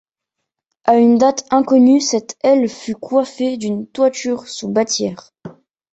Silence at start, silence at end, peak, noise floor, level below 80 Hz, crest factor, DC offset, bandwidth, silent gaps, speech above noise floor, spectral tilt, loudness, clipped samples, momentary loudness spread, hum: 0.85 s; 0.45 s; -2 dBFS; -79 dBFS; -62 dBFS; 16 dB; under 0.1%; 8.2 kHz; none; 64 dB; -4.5 dB/octave; -16 LUFS; under 0.1%; 12 LU; none